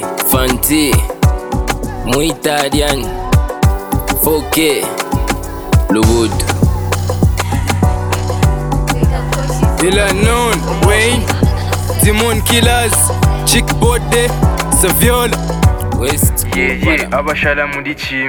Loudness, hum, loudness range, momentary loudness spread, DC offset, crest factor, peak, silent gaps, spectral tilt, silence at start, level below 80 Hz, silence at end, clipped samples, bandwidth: -13 LUFS; none; 3 LU; 6 LU; under 0.1%; 12 dB; 0 dBFS; none; -4.5 dB/octave; 0 s; -20 dBFS; 0 s; under 0.1%; over 20 kHz